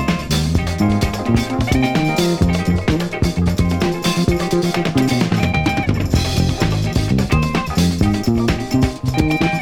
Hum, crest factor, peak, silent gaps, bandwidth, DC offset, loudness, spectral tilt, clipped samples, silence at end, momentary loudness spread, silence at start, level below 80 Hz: none; 16 dB; 0 dBFS; none; 18 kHz; under 0.1%; -17 LUFS; -6 dB/octave; under 0.1%; 0 s; 2 LU; 0 s; -28 dBFS